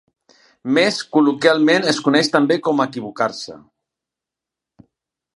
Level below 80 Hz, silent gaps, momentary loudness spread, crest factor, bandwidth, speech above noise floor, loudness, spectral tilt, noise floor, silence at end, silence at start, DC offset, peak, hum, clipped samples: -70 dBFS; none; 9 LU; 18 dB; 11.5 kHz; 69 dB; -17 LUFS; -4.5 dB/octave; -86 dBFS; 1.75 s; 0.65 s; under 0.1%; 0 dBFS; none; under 0.1%